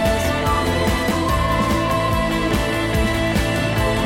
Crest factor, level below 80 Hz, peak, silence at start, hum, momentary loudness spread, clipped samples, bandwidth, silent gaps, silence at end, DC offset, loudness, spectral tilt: 12 dB; -28 dBFS; -6 dBFS; 0 s; none; 1 LU; under 0.1%; 17 kHz; none; 0 s; under 0.1%; -19 LUFS; -5.5 dB/octave